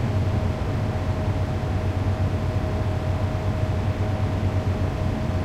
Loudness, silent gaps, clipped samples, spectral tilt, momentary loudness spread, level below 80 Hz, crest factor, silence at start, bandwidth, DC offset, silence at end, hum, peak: -25 LUFS; none; under 0.1%; -8 dB/octave; 1 LU; -32 dBFS; 12 dB; 0 s; 9 kHz; under 0.1%; 0 s; none; -10 dBFS